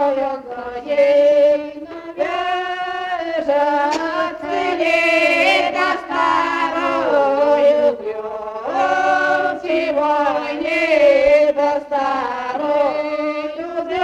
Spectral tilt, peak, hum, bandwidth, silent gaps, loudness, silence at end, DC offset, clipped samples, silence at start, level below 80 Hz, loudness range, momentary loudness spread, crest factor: -3.5 dB/octave; -4 dBFS; none; 10 kHz; none; -17 LUFS; 0 s; under 0.1%; under 0.1%; 0 s; -54 dBFS; 3 LU; 11 LU; 14 dB